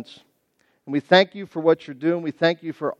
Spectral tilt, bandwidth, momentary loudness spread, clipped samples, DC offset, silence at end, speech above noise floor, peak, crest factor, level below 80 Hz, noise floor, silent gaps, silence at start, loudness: -6.5 dB/octave; 7.8 kHz; 10 LU; under 0.1%; under 0.1%; 0.05 s; 46 dB; -2 dBFS; 22 dB; -76 dBFS; -67 dBFS; none; 0 s; -21 LUFS